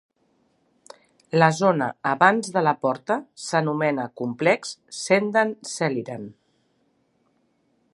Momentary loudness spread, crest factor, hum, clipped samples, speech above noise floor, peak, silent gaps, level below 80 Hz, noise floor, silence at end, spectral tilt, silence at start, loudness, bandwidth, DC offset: 12 LU; 24 dB; none; under 0.1%; 45 dB; -2 dBFS; none; -74 dBFS; -67 dBFS; 1.6 s; -5 dB/octave; 1.35 s; -22 LUFS; 11.5 kHz; under 0.1%